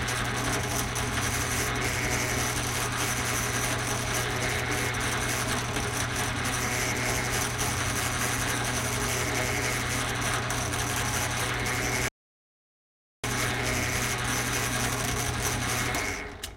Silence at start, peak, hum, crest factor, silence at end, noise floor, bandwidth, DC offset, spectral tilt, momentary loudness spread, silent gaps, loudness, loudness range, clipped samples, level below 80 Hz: 0 s; -14 dBFS; none; 16 dB; 0 s; under -90 dBFS; 16.5 kHz; under 0.1%; -3 dB/octave; 2 LU; 12.11-13.23 s; -27 LUFS; 2 LU; under 0.1%; -42 dBFS